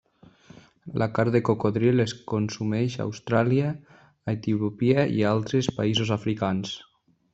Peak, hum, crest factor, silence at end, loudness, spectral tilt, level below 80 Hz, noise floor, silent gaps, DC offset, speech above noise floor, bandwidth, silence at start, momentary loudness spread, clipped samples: -6 dBFS; none; 20 dB; 0.5 s; -25 LUFS; -6.5 dB/octave; -60 dBFS; -53 dBFS; none; under 0.1%; 29 dB; 8 kHz; 0.85 s; 10 LU; under 0.1%